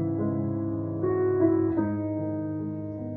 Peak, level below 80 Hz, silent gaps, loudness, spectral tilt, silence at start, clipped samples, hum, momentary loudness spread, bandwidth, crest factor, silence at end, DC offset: -10 dBFS; -56 dBFS; none; -28 LUFS; -13.5 dB/octave; 0 s; under 0.1%; none; 9 LU; 2.4 kHz; 16 dB; 0 s; under 0.1%